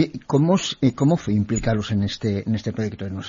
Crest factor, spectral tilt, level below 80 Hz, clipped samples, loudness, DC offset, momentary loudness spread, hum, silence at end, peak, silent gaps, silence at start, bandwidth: 16 dB; -6 dB/octave; -44 dBFS; under 0.1%; -22 LUFS; under 0.1%; 7 LU; none; 0 s; -4 dBFS; none; 0 s; 7.6 kHz